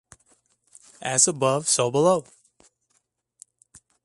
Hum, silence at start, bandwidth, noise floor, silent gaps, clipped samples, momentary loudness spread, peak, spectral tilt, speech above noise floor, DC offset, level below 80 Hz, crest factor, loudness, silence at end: none; 1 s; 11.5 kHz; -71 dBFS; none; under 0.1%; 7 LU; -4 dBFS; -3 dB/octave; 50 dB; under 0.1%; -70 dBFS; 22 dB; -21 LUFS; 1.85 s